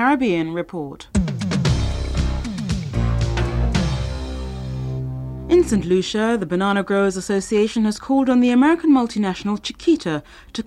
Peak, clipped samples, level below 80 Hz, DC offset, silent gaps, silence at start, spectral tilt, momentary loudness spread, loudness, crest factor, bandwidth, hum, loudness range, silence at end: -6 dBFS; under 0.1%; -30 dBFS; under 0.1%; none; 0 s; -6.5 dB/octave; 12 LU; -20 LUFS; 14 dB; 12 kHz; none; 5 LU; 0.05 s